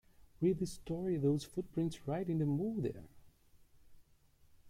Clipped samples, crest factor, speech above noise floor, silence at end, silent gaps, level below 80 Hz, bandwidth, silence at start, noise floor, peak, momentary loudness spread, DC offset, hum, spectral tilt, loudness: under 0.1%; 16 dB; 31 dB; 0 s; none; -62 dBFS; 15.5 kHz; 0.2 s; -67 dBFS; -22 dBFS; 6 LU; under 0.1%; none; -8 dB/octave; -37 LUFS